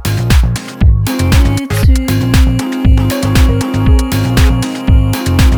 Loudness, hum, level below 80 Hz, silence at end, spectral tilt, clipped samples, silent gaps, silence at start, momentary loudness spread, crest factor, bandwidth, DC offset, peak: -12 LUFS; none; -12 dBFS; 0 s; -6 dB/octave; under 0.1%; none; 0 s; 2 LU; 10 dB; over 20 kHz; under 0.1%; 0 dBFS